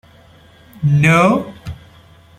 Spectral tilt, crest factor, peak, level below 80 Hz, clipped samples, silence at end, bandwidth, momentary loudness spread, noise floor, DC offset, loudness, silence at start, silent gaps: -7 dB/octave; 16 dB; -2 dBFS; -46 dBFS; under 0.1%; 0.65 s; 13.5 kHz; 22 LU; -46 dBFS; under 0.1%; -14 LUFS; 0.8 s; none